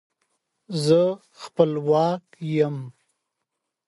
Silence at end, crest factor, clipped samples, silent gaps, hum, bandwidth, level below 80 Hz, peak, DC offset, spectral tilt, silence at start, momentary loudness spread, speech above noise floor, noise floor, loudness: 1 s; 20 dB; under 0.1%; none; none; 11.5 kHz; -70 dBFS; -4 dBFS; under 0.1%; -7 dB/octave; 0.7 s; 16 LU; 59 dB; -81 dBFS; -23 LUFS